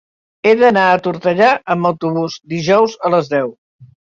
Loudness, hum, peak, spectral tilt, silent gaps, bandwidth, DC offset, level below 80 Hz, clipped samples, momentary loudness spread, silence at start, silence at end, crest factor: -14 LUFS; none; -2 dBFS; -6 dB/octave; 3.58-3.79 s; 7.6 kHz; under 0.1%; -58 dBFS; under 0.1%; 10 LU; 0.45 s; 0.3 s; 14 dB